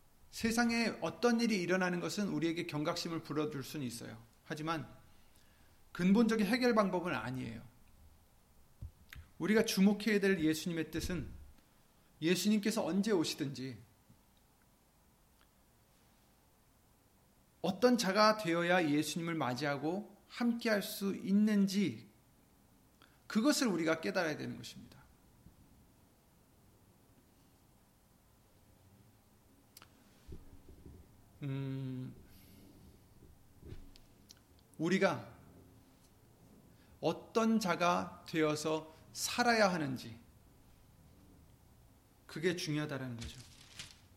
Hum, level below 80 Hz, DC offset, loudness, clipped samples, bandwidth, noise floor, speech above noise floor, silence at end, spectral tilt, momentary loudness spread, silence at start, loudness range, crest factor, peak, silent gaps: none; -62 dBFS; under 0.1%; -34 LUFS; under 0.1%; 16.5 kHz; -69 dBFS; 35 dB; 0.3 s; -5 dB/octave; 20 LU; 0.3 s; 14 LU; 22 dB; -16 dBFS; none